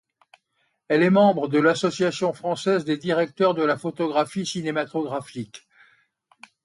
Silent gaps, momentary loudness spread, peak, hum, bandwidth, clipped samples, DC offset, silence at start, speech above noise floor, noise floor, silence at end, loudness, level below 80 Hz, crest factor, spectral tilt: none; 10 LU; -6 dBFS; none; 11.5 kHz; under 0.1%; under 0.1%; 0.9 s; 50 dB; -72 dBFS; 1.05 s; -22 LUFS; -70 dBFS; 18 dB; -5.5 dB/octave